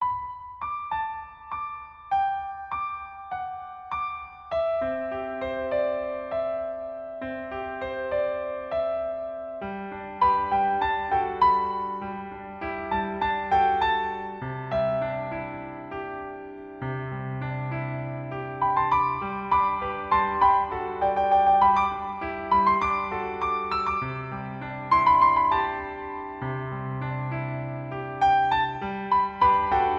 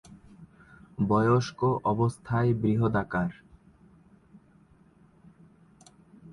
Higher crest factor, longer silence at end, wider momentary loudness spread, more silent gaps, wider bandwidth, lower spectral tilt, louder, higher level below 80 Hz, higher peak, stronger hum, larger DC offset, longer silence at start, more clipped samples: about the same, 18 dB vs 20 dB; about the same, 0 s vs 0 s; first, 14 LU vs 8 LU; neither; second, 6.8 kHz vs 11 kHz; about the same, -7.5 dB/octave vs -8 dB/octave; about the same, -26 LUFS vs -27 LUFS; first, -50 dBFS vs -56 dBFS; about the same, -8 dBFS vs -10 dBFS; neither; neither; about the same, 0 s vs 0.1 s; neither